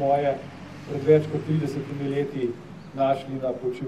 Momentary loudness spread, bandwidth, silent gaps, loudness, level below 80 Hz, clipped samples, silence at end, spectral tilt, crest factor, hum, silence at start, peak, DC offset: 16 LU; 11.5 kHz; none; -26 LUFS; -60 dBFS; under 0.1%; 0 s; -8 dB/octave; 20 dB; none; 0 s; -6 dBFS; 0.2%